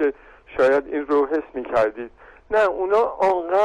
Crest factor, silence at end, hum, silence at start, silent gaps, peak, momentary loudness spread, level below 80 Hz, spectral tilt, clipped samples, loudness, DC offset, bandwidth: 12 dB; 0 s; none; 0 s; none; -10 dBFS; 7 LU; -52 dBFS; -5.5 dB/octave; under 0.1%; -21 LUFS; under 0.1%; 9.6 kHz